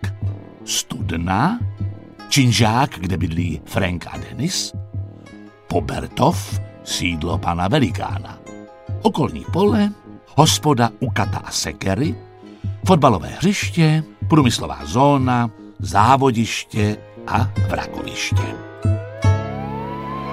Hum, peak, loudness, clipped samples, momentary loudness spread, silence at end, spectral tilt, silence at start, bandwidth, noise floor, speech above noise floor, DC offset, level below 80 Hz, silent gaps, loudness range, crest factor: none; 0 dBFS; -19 LUFS; under 0.1%; 15 LU; 0 s; -5 dB/octave; 0 s; 15.5 kHz; -41 dBFS; 23 dB; under 0.1%; -40 dBFS; none; 6 LU; 18 dB